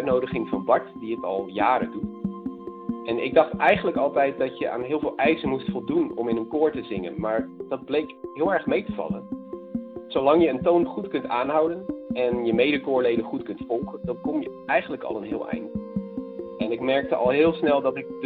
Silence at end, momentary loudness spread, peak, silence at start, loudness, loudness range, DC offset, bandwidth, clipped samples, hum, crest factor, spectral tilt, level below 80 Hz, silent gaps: 0 s; 12 LU; -4 dBFS; 0 s; -25 LUFS; 5 LU; under 0.1%; 4.6 kHz; under 0.1%; none; 20 dB; -9 dB/octave; -56 dBFS; none